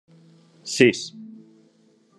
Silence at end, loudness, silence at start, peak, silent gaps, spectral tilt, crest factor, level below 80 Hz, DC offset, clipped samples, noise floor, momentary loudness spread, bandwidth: 0.9 s; -20 LUFS; 0.65 s; 0 dBFS; none; -4 dB/octave; 26 dB; -74 dBFS; under 0.1%; under 0.1%; -59 dBFS; 25 LU; 12 kHz